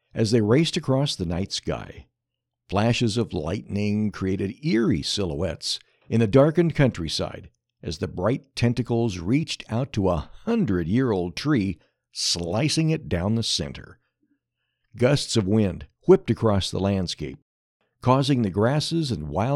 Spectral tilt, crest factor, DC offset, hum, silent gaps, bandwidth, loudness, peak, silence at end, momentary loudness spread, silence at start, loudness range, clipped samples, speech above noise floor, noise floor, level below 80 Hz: -5.5 dB/octave; 20 dB; under 0.1%; none; 17.42-17.80 s; 12.5 kHz; -24 LUFS; -4 dBFS; 0 s; 10 LU; 0.15 s; 3 LU; under 0.1%; 60 dB; -83 dBFS; -46 dBFS